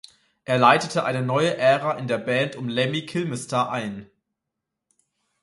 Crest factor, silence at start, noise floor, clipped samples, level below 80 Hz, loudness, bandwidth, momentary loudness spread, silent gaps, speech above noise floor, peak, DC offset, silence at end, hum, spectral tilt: 22 dB; 0.5 s; -83 dBFS; under 0.1%; -66 dBFS; -22 LUFS; 11.5 kHz; 11 LU; none; 61 dB; -2 dBFS; under 0.1%; 1.4 s; none; -5 dB/octave